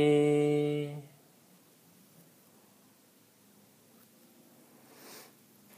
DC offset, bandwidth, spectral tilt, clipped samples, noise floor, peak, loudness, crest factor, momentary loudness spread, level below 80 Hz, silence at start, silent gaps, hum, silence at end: under 0.1%; 15.5 kHz; -7 dB/octave; under 0.1%; -63 dBFS; -16 dBFS; -29 LUFS; 20 dB; 29 LU; -82 dBFS; 0 s; none; none; 0.55 s